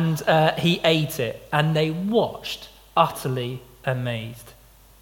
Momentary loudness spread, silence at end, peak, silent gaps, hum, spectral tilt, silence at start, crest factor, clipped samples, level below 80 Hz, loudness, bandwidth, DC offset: 13 LU; 0.5 s; -4 dBFS; none; none; -5.5 dB/octave; 0 s; 20 dB; under 0.1%; -54 dBFS; -23 LUFS; 17.5 kHz; under 0.1%